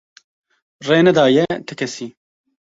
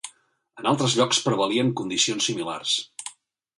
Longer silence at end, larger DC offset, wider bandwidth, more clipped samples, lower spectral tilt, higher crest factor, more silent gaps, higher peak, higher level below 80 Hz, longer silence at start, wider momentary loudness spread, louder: about the same, 0.6 s vs 0.5 s; neither; second, 8 kHz vs 11.5 kHz; neither; first, -5.5 dB/octave vs -3.5 dB/octave; about the same, 18 dB vs 18 dB; neither; first, -2 dBFS vs -8 dBFS; first, -58 dBFS vs -68 dBFS; first, 0.8 s vs 0.05 s; about the same, 18 LU vs 16 LU; first, -16 LUFS vs -23 LUFS